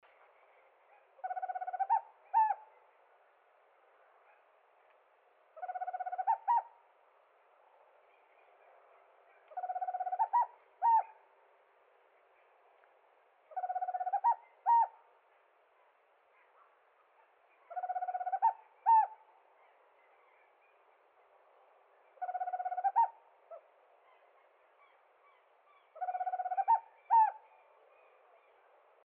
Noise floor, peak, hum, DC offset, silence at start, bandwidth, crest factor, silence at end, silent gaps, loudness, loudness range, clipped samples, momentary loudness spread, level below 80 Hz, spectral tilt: -69 dBFS; -20 dBFS; none; under 0.1%; 1.25 s; 3.2 kHz; 18 dB; 1.7 s; none; -34 LUFS; 11 LU; under 0.1%; 17 LU; under -90 dBFS; 4 dB/octave